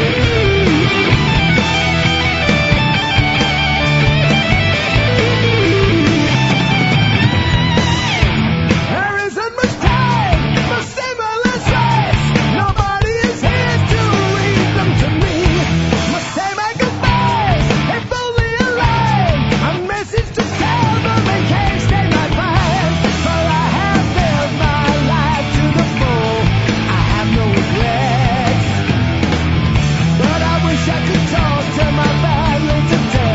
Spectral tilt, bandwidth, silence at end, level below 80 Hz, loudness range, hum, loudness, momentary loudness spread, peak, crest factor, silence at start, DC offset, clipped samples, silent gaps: -5.5 dB/octave; 8 kHz; 0 s; -26 dBFS; 3 LU; none; -14 LUFS; 4 LU; 0 dBFS; 14 dB; 0 s; under 0.1%; under 0.1%; none